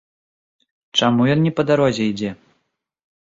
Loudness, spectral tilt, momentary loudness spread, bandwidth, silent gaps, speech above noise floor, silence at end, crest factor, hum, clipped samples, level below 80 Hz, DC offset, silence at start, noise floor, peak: -18 LUFS; -6 dB/octave; 8 LU; 7.8 kHz; none; 55 dB; 0.9 s; 18 dB; none; under 0.1%; -56 dBFS; under 0.1%; 0.95 s; -72 dBFS; -2 dBFS